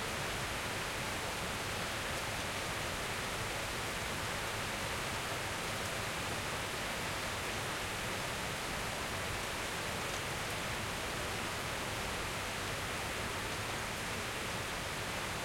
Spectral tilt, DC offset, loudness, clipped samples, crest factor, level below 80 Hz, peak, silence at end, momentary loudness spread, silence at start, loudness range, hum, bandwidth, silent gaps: -2.5 dB/octave; under 0.1%; -37 LUFS; under 0.1%; 14 dB; -54 dBFS; -24 dBFS; 0 s; 1 LU; 0 s; 0 LU; none; 16.5 kHz; none